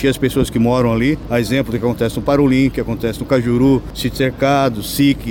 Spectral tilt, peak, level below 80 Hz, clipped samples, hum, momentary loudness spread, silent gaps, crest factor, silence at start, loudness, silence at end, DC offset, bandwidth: -6.5 dB/octave; -4 dBFS; -34 dBFS; under 0.1%; none; 5 LU; none; 12 dB; 0 s; -16 LUFS; 0 s; under 0.1%; 17 kHz